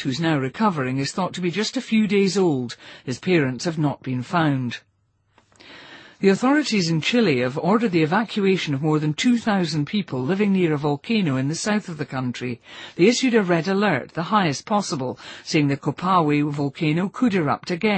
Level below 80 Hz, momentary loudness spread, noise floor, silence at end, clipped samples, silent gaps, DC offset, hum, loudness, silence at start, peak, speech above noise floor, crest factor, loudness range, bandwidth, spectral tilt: -62 dBFS; 9 LU; -66 dBFS; 0 s; under 0.1%; none; under 0.1%; none; -21 LUFS; 0 s; -4 dBFS; 44 dB; 18 dB; 3 LU; 8.8 kHz; -5.5 dB/octave